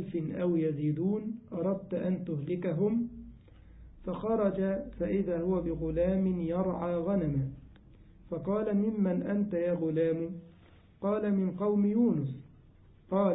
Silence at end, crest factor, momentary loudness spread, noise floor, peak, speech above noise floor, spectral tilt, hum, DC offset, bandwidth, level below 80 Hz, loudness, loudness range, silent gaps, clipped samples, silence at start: 0 s; 16 dB; 10 LU; -58 dBFS; -16 dBFS; 27 dB; -12.5 dB/octave; none; under 0.1%; 4 kHz; -54 dBFS; -31 LUFS; 2 LU; none; under 0.1%; 0 s